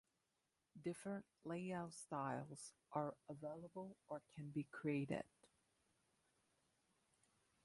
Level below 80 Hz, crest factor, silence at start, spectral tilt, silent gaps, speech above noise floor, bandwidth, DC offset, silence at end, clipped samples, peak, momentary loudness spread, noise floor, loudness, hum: -86 dBFS; 22 dB; 0.75 s; -6.5 dB/octave; none; 40 dB; 11.5 kHz; under 0.1%; 2.2 s; under 0.1%; -30 dBFS; 10 LU; -89 dBFS; -50 LUFS; none